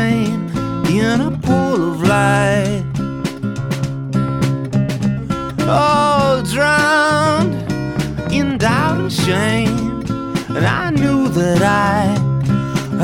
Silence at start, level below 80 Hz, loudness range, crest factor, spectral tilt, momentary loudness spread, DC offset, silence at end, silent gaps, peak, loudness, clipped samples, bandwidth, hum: 0 s; -38 dBFS; 3 LU; 14 dB; -6 dB/octave; 8 LU; under 0.1%; 0 s; none; -2 dBFS; -16 LUFS; under 0.1%; 16.5 kHz; none